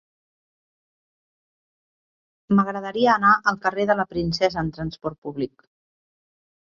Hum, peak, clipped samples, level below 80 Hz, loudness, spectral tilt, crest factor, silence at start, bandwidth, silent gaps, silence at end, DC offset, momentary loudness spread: none; -4 dBFS; under 0.1%; -52 dBFS; -22 LUFS; -6 dB/octave; 20 dB; 2.5 s; 7.2 kHz; 5.18-5.22 s; 1.2 s; under 0.1%; 14 LU